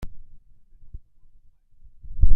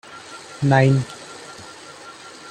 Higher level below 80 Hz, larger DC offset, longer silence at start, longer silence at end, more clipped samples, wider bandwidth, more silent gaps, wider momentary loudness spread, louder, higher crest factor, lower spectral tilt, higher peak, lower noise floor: first, -26 dBFS vs -58 dBFS; neither; about the same, 0.05 s vs 0.1 s; about the same, 0 s vs 0 s; neither; second, 0.8 kHz vs 10 kHz; neither; about the same, 22 LU vs 22 LU; second, -36 LUFS vs -19 LUFS; about the same, 18 dB vs 20 dB; first, -9 dB/octave vs -6.5 dB/octave; about the same, -2 dBFS vs -2 dBFS; first, -50 dBFS vs -40 dBFS